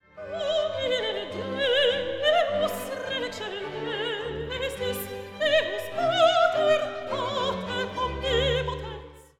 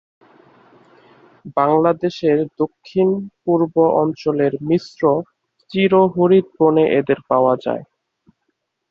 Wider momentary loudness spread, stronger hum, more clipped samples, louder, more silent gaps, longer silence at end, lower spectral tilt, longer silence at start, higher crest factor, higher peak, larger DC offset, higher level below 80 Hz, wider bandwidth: about the same, 11 LU vs 9 LU; neither; neither; second, -26 LUFS vs -17 LUFS; neither; second, 0.15 s vs 1.05 s; second, -4 dB/octave vs -8.5 dB/octave; second, 0.15 s vs 1.45 s; about the same, 18 dB vs 16 dB; second, -8 dBFS vs -2 dBFS; neither; first, -46 dBFS vs -60 dBFS; first, 17 kHz vs 6.8 kHz